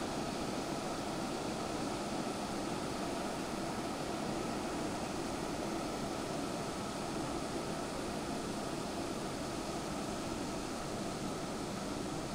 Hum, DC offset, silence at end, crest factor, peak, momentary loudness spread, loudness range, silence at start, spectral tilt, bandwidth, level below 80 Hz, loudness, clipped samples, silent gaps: none; under 0.1%; 0 s; 14 dB; -26 dBFS; 1 LU; 1 LU; 0 s; -4.5 dB/octave; 16 kHz; -56 dBFS; -39 LUFS; under 0.1%; none